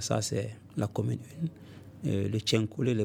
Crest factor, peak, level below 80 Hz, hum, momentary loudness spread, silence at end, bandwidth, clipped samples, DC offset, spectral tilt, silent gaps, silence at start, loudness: 20 dB; -12 dBFS; -64 dBFS; none; 10 LU; 0 s; 16.5 kHz; under 0.1%; under 0.1%; -5.5 dB/octave; none; 0 s; -32 LUFS